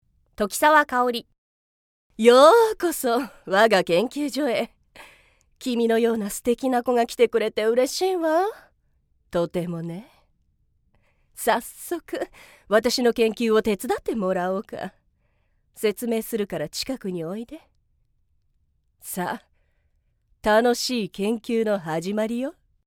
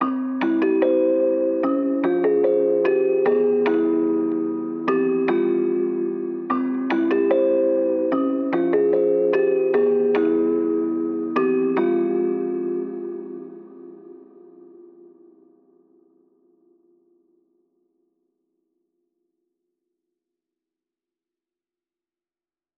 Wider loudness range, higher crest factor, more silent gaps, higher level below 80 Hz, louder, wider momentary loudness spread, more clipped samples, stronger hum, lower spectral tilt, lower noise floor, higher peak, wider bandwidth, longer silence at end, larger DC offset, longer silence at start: first, 11 LU vs 7 LU; first, 22 dB vs 16 dB; first, 1.38-2.10 s vs none; first, -58 dBFS vs -86 dBFS; about the same, -22 LUFS vs -21 LUFS; first, 14 LU vs 7 LU; neither; neither; second, -4 dB/octave vs -6 dB/octave; second, -67 dBFS vs under -90 dBFS; first, -2 dBFS vs -6 dBFS; first, 18.5 kHz vs 5.2 kHz; second, 0.35 s vs 8.6 s; neither; first, 0.4 s vs 0 s